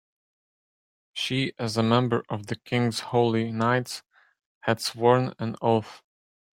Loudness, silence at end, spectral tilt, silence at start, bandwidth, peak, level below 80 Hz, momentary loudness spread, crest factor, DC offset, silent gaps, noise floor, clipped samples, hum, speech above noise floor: -25 LUFS; 0.6 s; -5.5 dB/octave; 1.15 s; 16 kHz; -6 dBFS; -64 dBFS; 11 LU; 20 dB; under 0.1%; 4.46-4.61 s; under -90 dBFS; under 0.1%; none; over 65 dB